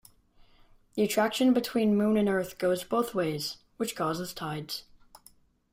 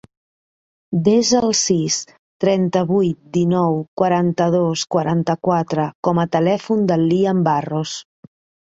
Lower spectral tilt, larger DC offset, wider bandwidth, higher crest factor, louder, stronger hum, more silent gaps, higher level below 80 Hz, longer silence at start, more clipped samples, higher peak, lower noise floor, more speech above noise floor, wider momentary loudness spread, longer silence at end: about the same, -5 dB/octave vs -5.5 dB/octave; neither; first, 16 kHz vs 8 kHz; about the same, 16 dB vs 16 dB; second, -29 LUFS vs -18 LUFS; neither; second, none vs 2.19-2.40 s, 3.88-3.97 s, 5.95-6.03 s; second, -62 dBFS vs -56 dBFS; about the same, 0.95 s vs 0.9 s; neither; second, -12 dBFS vs -2 dBFS; second, -61 dBFS vs under -90 dBFS; second, 33 dB vs over 73 dB; first, 11 LU vs 6 LU; first, 0.9 s vs 0.65 s